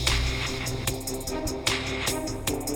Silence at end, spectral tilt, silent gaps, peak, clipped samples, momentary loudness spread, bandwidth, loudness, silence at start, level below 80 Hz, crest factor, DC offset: 0 s; -3 dB/octave; none; -8 dBFS; under 0.1%; 5 LU; over 20 kHz; -28 LUFS; 0 s; -36 dBFS; 20 dB; under 0.1%